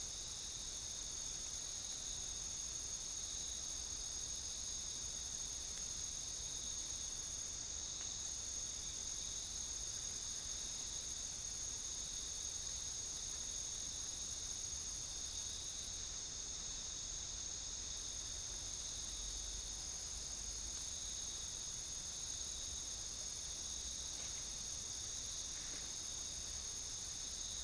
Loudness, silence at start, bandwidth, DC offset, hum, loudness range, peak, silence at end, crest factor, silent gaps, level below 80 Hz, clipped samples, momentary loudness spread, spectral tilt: -43 LUFS; 0 s; 10.5 kHz; under 0.1%; none; 1 LU; -32 dBFS; 0 s; 14 dB; none; -58 dBFS; under 0.1%; 1 LU; 0 dB/octave